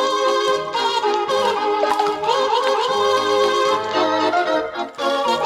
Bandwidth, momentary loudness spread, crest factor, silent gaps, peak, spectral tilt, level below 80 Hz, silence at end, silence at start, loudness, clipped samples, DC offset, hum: 14.5 kHz; 3 LU; 14 dB; none; -6 dBFS; -2.5 dB/octave; -62 dBFS; 0 s; 0 s; -19 LUFS; under 0.1%; under 0.1%; none